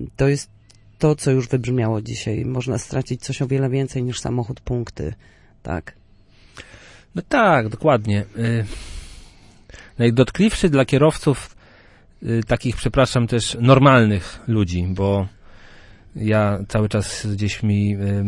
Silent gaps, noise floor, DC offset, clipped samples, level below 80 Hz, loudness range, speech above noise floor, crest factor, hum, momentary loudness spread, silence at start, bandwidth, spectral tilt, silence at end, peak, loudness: none; -50 dBFS; under 0.1%; under 0.1%; -40 dBFS; 7 LU; 31 dB; 18 dB; none; 15 LU; 0 s; 11.5 kHz; -6.5 dB/octave; 0 s; -2 dBFS; -20 LUFS